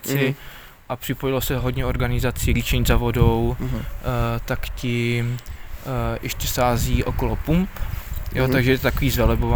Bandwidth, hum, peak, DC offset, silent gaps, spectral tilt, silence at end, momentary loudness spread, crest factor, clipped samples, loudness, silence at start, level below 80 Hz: over 20 kHz; none; -2 dBFS; under 0.1%; none; -5.5 dB/octave; 0 s; 12 LU; 18 dB; under 0.1%; -22 LUFS; 0 s; -28 dBFS